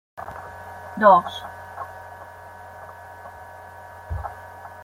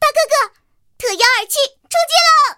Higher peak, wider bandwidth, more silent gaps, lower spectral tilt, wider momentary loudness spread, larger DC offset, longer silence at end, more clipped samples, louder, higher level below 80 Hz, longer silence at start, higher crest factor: about the same, -2 dBFS vs 0 dBFS; about the same, 16 kHz vs 17.5 kHz; neither; first, -6 dB/octave vs 1.5 dB/octave; first, 25 LU vs 12 LU; neither; about the same, 0 s vs 0.05 s; neither; second, -20 LUFS vs -14 LUFS; first, -48 dBFS vs -58 dBFS; first, 0.15 s vs 0 s; first, 24 dB vs 14 dB